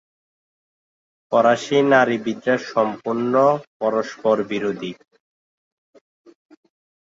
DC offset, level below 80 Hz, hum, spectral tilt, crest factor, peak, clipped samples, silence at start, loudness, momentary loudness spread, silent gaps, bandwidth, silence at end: under 0.1%; -68 dBFS; none; -5.5 dB/octave; 18 dB; -2 dBFS; under 0.1%; 1.3 s; -20 LUFS; 9 LU; 3.67-3.80 s; 7.8 kHz; 2.15 s